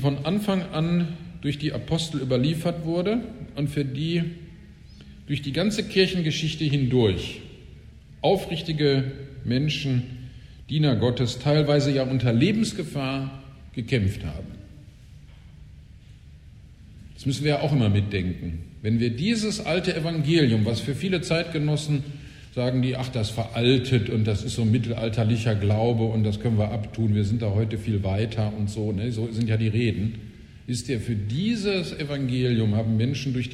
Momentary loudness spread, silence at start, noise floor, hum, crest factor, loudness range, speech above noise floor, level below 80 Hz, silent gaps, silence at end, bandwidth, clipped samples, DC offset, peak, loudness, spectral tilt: 11 LU; 0 s; -47 dBFS; none; 18 dB; 5 LU; 23 dB; -46 dBFS; none; 0 s; 13 kHz; under 0.1%; under 0.1%; -8 dBFS; -25 LUFS; -6.5 dB/octave